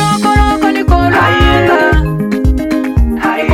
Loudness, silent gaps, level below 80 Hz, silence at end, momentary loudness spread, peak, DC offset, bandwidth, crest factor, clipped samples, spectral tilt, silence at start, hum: -11 LUFS; none; -16 dBFS; 0 s; 5 LU; 0 dBFS; under 0.1%; 15 kHz; 10 dB; under 0.1%; -6 dB/octave; 0 s; none